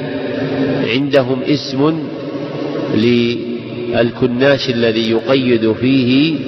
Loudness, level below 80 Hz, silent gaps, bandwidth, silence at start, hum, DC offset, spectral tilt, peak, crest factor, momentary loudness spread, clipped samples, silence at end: -15 LUFS; -50 dBFS; none; 6.4 kHz; 0 s; none; under 0.1%; -7 dB/octave; -2 dBFS; 12 dB; 9 LU; under 0.1%; 0 s